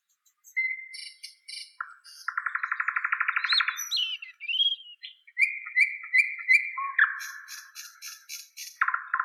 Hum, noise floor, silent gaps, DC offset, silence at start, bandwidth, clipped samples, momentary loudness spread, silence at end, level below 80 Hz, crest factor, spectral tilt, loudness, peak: none; -61 dBFS; none; under 0.1%; 0.45 s; 16.5 kHz; under 0.1%; 19 LU; 0 s; under -90 dBFS; 20 dB; 12 dB/octave; -26 LUFS; -10 dBFS